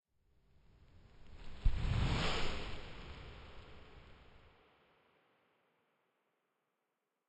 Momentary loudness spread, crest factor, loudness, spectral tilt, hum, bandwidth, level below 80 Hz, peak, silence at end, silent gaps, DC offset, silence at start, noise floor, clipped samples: 24 LU; 22 dB; -40 LUFS; -5.5 dB/octave; none; 9 kHz; -46 dBFS; -20 dBFS; 2.9 s; none; under 0.1%; 1.15 s; -87 dBFS; under 0.1%